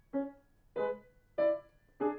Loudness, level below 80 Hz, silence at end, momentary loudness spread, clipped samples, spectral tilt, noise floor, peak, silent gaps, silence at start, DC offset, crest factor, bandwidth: -37 LUFS; -68 dBFS; 0 s; 12 LU; under 0.1%; -8 dB/octave; -54 dBFS; -22 dBFS; none; 0.15 s; under 0.1%; 16 dB; 4.5 kHz